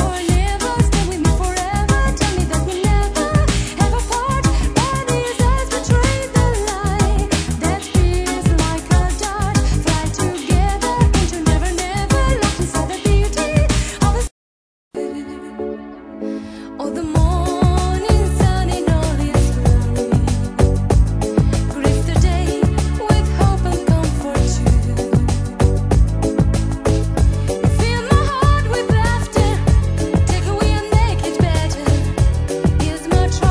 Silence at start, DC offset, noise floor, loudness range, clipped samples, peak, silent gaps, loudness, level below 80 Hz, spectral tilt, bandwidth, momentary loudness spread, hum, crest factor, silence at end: 0 s; under 0.1%; under -90 dBFS; 3 LU; under 0.1%; 0 dBFS; 14.31-14.91 s; -17 LUFS; -20 dBFS; -5.5 dB/octave; 11 kHz; 4 LU; none; 16 dB; 0 s